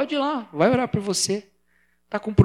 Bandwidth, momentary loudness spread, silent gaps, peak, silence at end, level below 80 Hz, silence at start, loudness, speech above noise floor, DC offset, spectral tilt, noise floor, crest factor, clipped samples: 16 kHz; 10 LU; none; -2 dBFS; 0 s; -50 dBFS; 0 s; -23 LUFS; 45 dB; under 0.1%; -5 dB/octave; -66 dBFS; 20 dB; under 0.1%